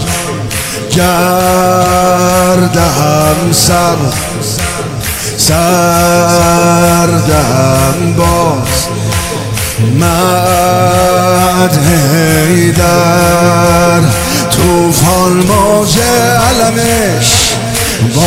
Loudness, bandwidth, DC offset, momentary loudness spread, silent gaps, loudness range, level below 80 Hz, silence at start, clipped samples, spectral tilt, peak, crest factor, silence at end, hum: -9 LUFS; 16.5 kHz; under 0.1%; 6 LU; none; 2 LU; -26 dBFS; 0 s; 0.5%; -4.5 dB/octave; 0 dBFS; 8 dB; 0 s; none